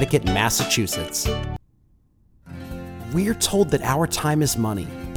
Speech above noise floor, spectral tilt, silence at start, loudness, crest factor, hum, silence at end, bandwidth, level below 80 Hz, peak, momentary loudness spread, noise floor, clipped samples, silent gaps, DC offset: 37 dB; -4 dB/octave; 0 s; -22 LUFS; 20 dB; none; 0 s; over 20 kHz; -38 dBFS; -4 dBFS; 16 LU; -59 dBFS; under 0.1%; none; under 0.1%